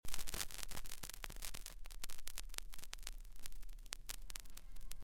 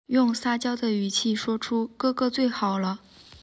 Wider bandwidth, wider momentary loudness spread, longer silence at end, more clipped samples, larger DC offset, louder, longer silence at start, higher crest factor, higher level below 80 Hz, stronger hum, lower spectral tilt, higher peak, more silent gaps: first, 17 kHz vs 8 kHz; first, 11 LU vs 5 LU; about the same, 0 s vs 0.05 s; neither; neither; second, -50 LUFS vs -26 LUFS; about the same, 0.05 s vs 0.1 s; first, 26 dB vs 14 dB; first, -52 dBFS vs -64 dBFS; neither; second, -1 dB/octave vs -4.5 dB/octave; second, -16 dBFS vs -12 dBFS; neither